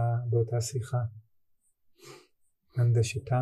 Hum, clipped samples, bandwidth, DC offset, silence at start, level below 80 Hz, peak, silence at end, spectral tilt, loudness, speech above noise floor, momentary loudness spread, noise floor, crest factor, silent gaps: none; under 0.1%; 12.5 kHz; under 0.1%; 0 s; -62 dBFS; -16 dBFS; 0 s; -6.5 dB/octave; -30 LUFS; 41 dB; 9 LU; -69 dBFS; 14 dB; none